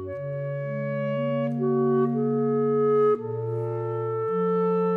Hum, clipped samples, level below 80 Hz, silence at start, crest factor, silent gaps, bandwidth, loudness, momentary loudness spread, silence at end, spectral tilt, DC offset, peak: none; under 0.1%; -74 dBFS; 0 s; 12 dB; none; 4 kHz; -25 LUFS; 8 LU; 0 s; -11 dB/octave; under 0.1%; -14 dBFS